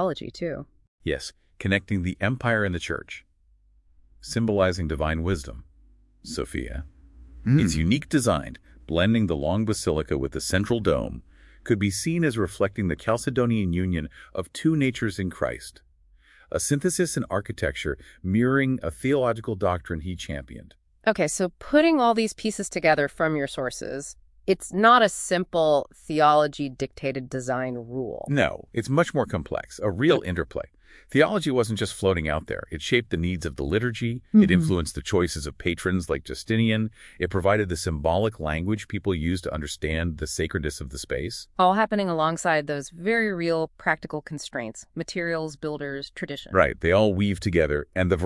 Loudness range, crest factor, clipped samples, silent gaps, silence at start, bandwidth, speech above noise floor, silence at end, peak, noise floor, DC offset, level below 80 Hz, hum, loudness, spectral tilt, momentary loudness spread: 5 LU; 22 dB; under 0.1%; 0.88-0.98 s; 0 s; 12 kHz; 36 dB; 0 s; -4 dBFS; -60 dBFS; under 0.1%; -44 dBFS; none; -25 LUFS; -5.5 dB/octave; 12 LU